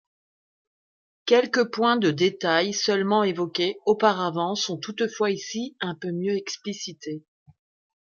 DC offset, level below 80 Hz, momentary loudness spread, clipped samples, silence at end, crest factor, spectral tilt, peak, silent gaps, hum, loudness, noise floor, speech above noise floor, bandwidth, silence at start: under 0.1%; -74 dBFS; 12 LU; under 0.1%; 0.95 s; 20 dB; -4 dB/octave; -6 dBFS; none; none; -24 LUFS; under -90 dBFS; over 66 dB; 7.4 kHz; 1.25 s